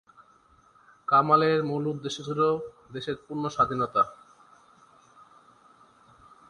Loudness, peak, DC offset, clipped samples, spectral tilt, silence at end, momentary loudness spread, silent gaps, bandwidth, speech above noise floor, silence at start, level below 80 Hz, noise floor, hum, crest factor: -26 LUFS; -8 dBFS; under 0.1%; under 0.1%; -6 dB/octave; 2.35 s; 14 LU; none; 10.5 kHz; 34 dB; 1.1 s; -64 dBFS; -60 dBFS; none; 22 dB